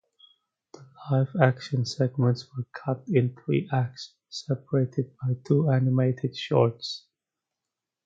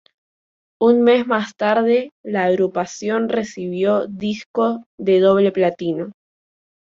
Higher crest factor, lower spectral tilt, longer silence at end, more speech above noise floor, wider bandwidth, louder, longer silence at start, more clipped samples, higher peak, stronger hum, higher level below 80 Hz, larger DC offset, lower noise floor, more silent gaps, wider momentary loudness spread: first, 24 dB vs 16 dB; first, -7.5 dB/octave vs -6 dB/octave; first, 1.05 s vs 0.75 s; second, 62 dB vs over 72 dB; about the same, 7.6 kHz vs 7.6 kHz; second, -26 LUFS vs -18 LUFS; about the same, 0.8 s vs 0.8 s; neither; about the same, -4 dBFS vs -2 dBFS; neither; about the same, -66 dBFS vs -62 dBFS; neither; about the same, -87 dBFS vs under -90 dBFS; second, none vs 2.12-2.24 s, 4.46-4.54 s, 4.86-4.98 s; about the same, 12 LU vs 10 LU